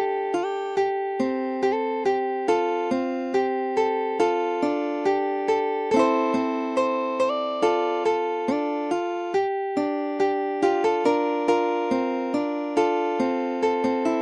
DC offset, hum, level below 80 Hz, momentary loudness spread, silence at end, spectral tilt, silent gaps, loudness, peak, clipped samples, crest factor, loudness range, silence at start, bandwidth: under 0.1%; none; -70 dBFS; 4 LU; 0 s; -5 dB/octave; none; -24 LUFS; -8 dBFS; under 0.1%; 16 dB; 1 LU; 0 s; 10.5 kHz